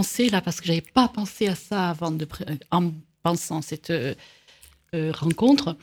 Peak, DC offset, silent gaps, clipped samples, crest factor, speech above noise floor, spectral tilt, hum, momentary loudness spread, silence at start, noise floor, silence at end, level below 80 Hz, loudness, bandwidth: -4 dBFS; under 0.1%; none; under 0.1%; 22 dB; 30 dB; -5 dB/octave; none; 11 LU; 0 s; -54 dBFS; 0.05 s; -56 dBFS; -25 LUFS; 19 kHz